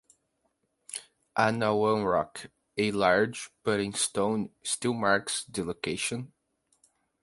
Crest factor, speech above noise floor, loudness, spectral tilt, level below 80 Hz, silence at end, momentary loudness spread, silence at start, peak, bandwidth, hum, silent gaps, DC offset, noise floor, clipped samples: 22 dB; 48 dB; -28 LUFS; -3.5 dB/octave; -62 dBFS; 0.95 s; 14 LU; 0.9 s; -8 dBFS; 12 kHz; none; none; under 0.1%; -76 dBFS; under 0.1%